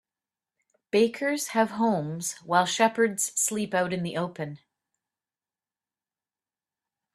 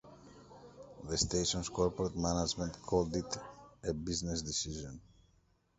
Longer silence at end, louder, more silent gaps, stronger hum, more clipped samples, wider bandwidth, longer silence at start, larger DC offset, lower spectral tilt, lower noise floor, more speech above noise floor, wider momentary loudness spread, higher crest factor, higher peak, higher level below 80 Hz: first, 2.6 s vs 0.8 s; first, -26 LUFS vs -36 LUFS; neither; neither; neither; first, 15 kHz vs 8.2 kHz; first, 0.95 s vs 0.05 s; neither; about the same, -3.5 dB/octave vs -4 dB/octave; first, under -90 dBFS vs -71 dBFS; first, over 64 dB vs 36 dB; second, 9 LU vs 21 LU; about the same, 22 dB vs 22 dB; first, -6 dBFS vs -16 dBFS; second, -72 dBFS vs -52 dBFS